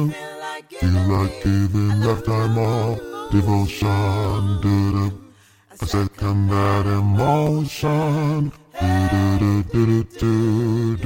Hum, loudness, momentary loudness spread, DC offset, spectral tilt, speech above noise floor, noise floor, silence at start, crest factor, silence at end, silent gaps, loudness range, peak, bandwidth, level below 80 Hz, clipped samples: none; -20 LUFS; 7 LU; under 0.1%; -7.5 dB/octave; 31 dB; -50 dBFS; 0 s; 16 dB; 0 s; none; 2 LU; -4 dBFS; 16.5 kHz; -38 dBFS; under 0.1%